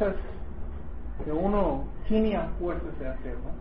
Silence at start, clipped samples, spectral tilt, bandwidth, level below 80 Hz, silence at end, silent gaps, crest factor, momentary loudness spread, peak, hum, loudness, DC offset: 0 s; under 0.1%; -11.5 dB/octave; 5.4 kHz; -36 dBFS; 0 s; none; 18 dB; 15 LU; -10 dBFS; none; -31 LUFS; 2%